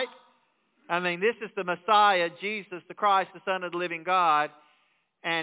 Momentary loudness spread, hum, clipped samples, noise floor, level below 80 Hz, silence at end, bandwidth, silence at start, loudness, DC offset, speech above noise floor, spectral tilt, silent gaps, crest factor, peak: 13 LU; none; under 0.1%; -69 dBFS; -86 dBFS; 0 s; 4 kHz; 0 s; -26 LUFS; under 0.1%; 43 dB; -1 dB/octave; none; 18 dB; -10 dBFS